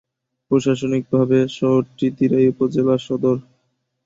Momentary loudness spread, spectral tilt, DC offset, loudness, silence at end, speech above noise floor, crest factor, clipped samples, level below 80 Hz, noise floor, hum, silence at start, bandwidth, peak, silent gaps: 5 LU; -7.5 dB/octave; under 0.1%; -19 LUFS; 0.65 s; 52 dB; 16 dB; under 0.1%; -58 dBFS; -70 dBFS; none; 0.5 s; 7.8 kHz; -4 dBFS; none